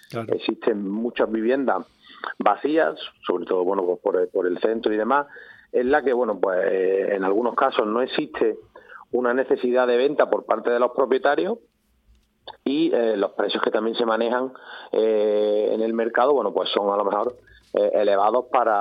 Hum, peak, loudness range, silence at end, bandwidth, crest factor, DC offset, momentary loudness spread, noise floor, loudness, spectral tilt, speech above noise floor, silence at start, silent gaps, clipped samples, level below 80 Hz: none; -2 dBFS; 2 LU; 0 s; 5.2 kHz; 20 dB; under 0.1%; 7 LU; -60 dBFS; -22 LUFS; -7 dB/octave; 38 dB; 0.1 s; none; under 0.1%; -66 dBFS